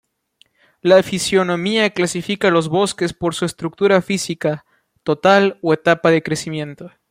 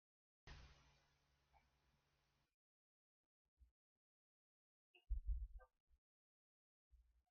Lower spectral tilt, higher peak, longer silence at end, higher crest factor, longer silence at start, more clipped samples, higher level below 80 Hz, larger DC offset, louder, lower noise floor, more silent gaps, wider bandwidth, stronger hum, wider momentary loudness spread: about the same, -4.5 dB/octave vs -5.5 dB/octave; first, 0 dBFS vs -36 dBFS; about the same, 0.25 s vs 0.35 s; second, 16 dB vs 22 dB; first, 0.85 s vs 0.45 s; neither; about the same, -56 dBFS vs -58 dBFS; neither; first, -17 LUFS vs -55 LUFS; second, -58 dBFS vs -86 dBFS; second, none vs 2.54-3.57 s, 3.71-4.94 s, 5.80-5.87 s, 5.98-6.91 s; first, 16 kHz vs 6.6 kHz; neither; second, 9 LU vs 17 LU